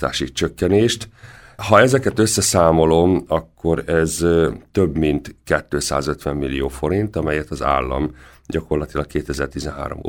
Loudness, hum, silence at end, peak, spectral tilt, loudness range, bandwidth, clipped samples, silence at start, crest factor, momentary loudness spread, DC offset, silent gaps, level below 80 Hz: -19 LUFS; none; 0 s; 0 dBFS; -5 dB/octave; 6 LU; 17.5 kHz; under 0.1%; 0 s; 18 dB; 11 LU; under 0.1%; none; -36 dBFS